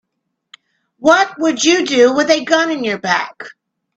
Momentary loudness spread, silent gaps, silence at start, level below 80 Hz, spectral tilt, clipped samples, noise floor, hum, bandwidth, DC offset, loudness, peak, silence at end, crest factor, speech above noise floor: 10 LU; none; 1 s; -62 dBFS; -2.5 dB/octave; under 0.1%; -74 dBFS; none; 8.4 kHz; under 0.1%; -14 LUFS; 0 dBFS; 0.45 s; 16 dB; 60 dB